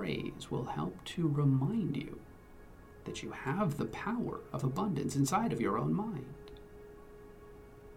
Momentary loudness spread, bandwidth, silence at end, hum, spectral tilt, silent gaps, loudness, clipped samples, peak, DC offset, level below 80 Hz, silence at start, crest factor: 23 LU; 16 kHz; 0 s; none; -6.5 dB/octave; none; -35 LUFS; under 0.1%; -18 dBFS; under 0.1%; -58 dBFS; 0 s; 18 dB